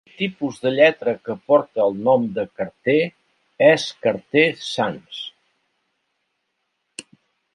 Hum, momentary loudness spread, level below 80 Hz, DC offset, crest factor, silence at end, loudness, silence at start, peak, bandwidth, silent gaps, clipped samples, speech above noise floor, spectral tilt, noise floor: none; 17 LU; -66 dBFS; under 0.1%; 20 dB; 0.55 s; -20 LUFS; 0.2 s; -2 dBFS; 11 kHz; none; under 0.1%; 55 dB; -5 dB/octave; -74 dBFS